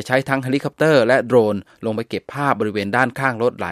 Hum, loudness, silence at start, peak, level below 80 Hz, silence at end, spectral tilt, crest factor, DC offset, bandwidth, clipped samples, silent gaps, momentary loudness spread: none; -19 LUFS; 0 s; 0 dBFS; -60 dBFS; 0 s; -6 dB/octave; 18 dB; under 0.1%; 14 kHz; under 0.1%; none; 11 LU